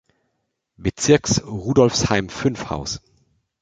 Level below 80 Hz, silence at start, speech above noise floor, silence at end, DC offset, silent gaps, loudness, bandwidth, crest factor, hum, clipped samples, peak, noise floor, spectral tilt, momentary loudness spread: -42 dBFS; 0.8 s; 55 dB; 0.65 s; under 0.1%; none; -20 LUFS; 9.6 kHz; 20 dB; none; under 0.1%; -2 dBFS; -74 dBFS; -4.5 dB/octave; 12 LU